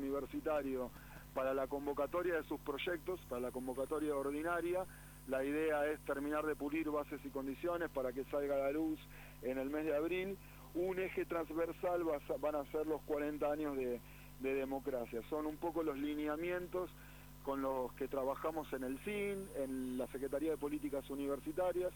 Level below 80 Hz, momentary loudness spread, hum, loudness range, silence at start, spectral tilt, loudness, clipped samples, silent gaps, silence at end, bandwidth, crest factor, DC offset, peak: -60 dBFS; 6 LU; 50 Hz at -60 dBFS; 2 LU; 0 s; -6 dB/octave; -41 LUFS; under 0.1%; none; 0 s; 19 kHz; 14 dB; under 0.1%; -26 dBFS